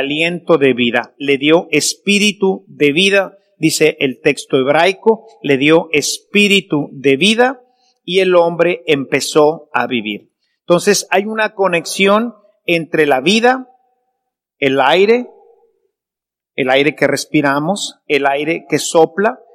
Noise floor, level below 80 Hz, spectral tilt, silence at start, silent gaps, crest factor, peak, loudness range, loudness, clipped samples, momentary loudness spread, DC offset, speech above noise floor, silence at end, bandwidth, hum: -86 dBFS; -62 dBFS; -4 dB/octave; 0 s; none; 14 dB; 0 dBFS; 3 LU; -13 LUFS; 0.2%; 7 LU; under 0.1%; 72 dB; 0.2 s; 15.5 kHz; none